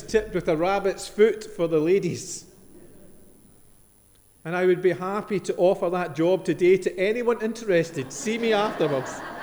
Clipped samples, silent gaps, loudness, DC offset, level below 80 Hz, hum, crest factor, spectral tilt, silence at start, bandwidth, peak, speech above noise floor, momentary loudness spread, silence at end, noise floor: under 0.1%; none; -24 LUFS; under 0.1%; -54 dBFS; none; 18 dB; -5.5 dB/octave; 0 s; over 20 kHz; -6 dBFS; 33 dB; 9 LU; 0 s; -57 dBFS